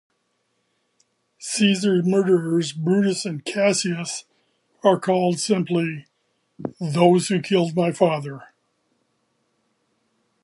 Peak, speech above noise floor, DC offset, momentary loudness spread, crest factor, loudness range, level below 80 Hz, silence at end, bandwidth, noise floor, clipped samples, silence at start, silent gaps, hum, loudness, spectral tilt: -2 dBFS; 51 dB; under 0.1%; 13 LU; 20 dB; 2 LU; -70 dBFS; 2 s; 11.5 kHz; -71 dBFS; under 0.1%; 1.4 s; none; none; -21 LUFS; -5 dB/octave